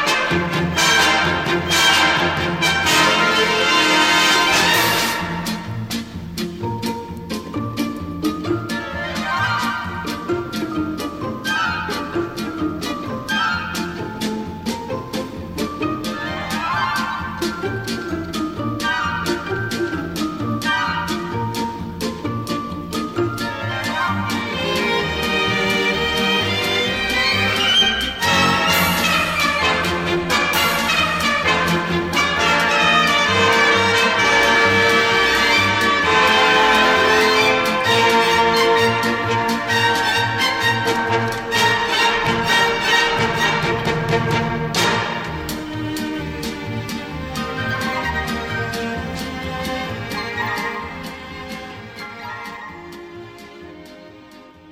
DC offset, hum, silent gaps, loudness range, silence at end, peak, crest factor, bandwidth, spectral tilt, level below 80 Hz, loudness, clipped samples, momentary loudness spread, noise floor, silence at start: under 0.1%; none; none; 11 LU; 0 s; -4 dBFS; 16 dB; 16.5 kHz; -3.5 dB/octave; -42 dBFS; -18 LUFS; under 0.1%; 13 LU; -43 dBFS; 0 s